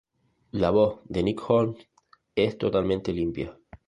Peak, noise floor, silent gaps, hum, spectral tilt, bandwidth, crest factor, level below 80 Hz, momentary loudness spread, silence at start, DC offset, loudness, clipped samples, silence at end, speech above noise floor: -6 dBFS; -57 dBFS; none; none; -8 dB/octave; 11 kHz; 20 dB; -50 dBFS; 13 LU; 0.55 s; under 0.1%; -26 LUFS; under 0.1%; 0.35 s; 32 dB